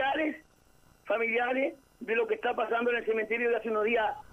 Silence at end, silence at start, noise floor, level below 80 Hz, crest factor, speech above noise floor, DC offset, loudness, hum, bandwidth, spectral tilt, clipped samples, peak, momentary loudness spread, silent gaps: 0.1 s; 0 s; -62 dBFS; -66 dBFS; 14 dB; 33 dB; under 0.1%; -30 LUFS; none; 10.5 kHz; -5 dB/octave; under 0.1%; -16 dBFS; 6 LU; none